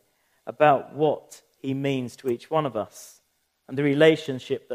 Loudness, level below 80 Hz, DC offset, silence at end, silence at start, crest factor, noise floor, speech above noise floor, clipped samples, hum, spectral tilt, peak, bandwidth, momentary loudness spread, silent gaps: -24 LUFS; -74 dBFS; under 0.1%; 0 s; 0.45 s; 22 dB; -71 dBFS; 47 dB; under 0.1%; none; -6 dB/octave; -4 dBFS; 15.5 kHz; 17 LU; none